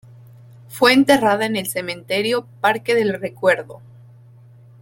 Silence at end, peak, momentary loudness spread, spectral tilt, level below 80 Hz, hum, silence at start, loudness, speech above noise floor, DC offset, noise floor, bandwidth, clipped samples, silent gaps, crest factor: 1.05 s; -2 dBFS; 11 LU; -4 dB/octave; -60 dBFS; none; 0.7 s; -18 LUFS; 28 dB; under 0.1%; -46 dBFS; 17 kHz; under 0.1%; none; 18 dB